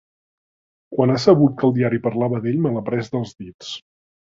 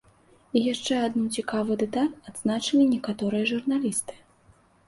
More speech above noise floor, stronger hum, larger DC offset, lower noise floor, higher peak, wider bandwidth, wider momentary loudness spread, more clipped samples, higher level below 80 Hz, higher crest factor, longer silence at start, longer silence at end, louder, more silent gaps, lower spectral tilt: first, over 71 dB vs 34 dB; neither; neither; first, under -90 dBFS vs -59 dBFS; first, 0 dBFS vs -8 dBFS; second, 7.8 kHz vs 12 kHz; first, 18 LU vs 7 LU; neither; first, -56 dBFS vs -64 dBFS; about the same, 20 dB vs 18 dB; first, 0.9 s vs 0.55 s; second, 0.5 s vs 0.7 s; first, -19 LUFS vs -26 LUFS; first, 3.54-3.59 s vs none; first, -7.5 dB/octave vs -4 dB/octave